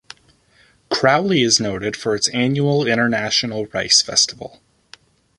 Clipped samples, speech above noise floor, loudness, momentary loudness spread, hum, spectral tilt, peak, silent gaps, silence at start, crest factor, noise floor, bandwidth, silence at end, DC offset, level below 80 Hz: under 0.1%; 37 dB; -17 LUFS; 10 LU; none; -3 dB/octave; 0 dBFS; none; 0.9 s; 18 dB; -55 dBFS; 11.5 kHz; 0.9 s; under 0.1%; -54 dBFS